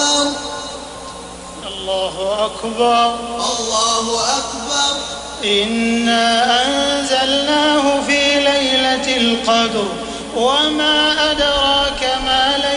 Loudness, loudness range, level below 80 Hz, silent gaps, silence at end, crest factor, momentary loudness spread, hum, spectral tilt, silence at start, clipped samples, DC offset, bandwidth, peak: -15 LUFS; 4 LU; -40 dBFS; none; 0 s; 14 dB; 12 LU; none; -1.5 dB/octave; 0 s; under 0.1%; under 0.1%; 11.5 kHz; -4 dBFS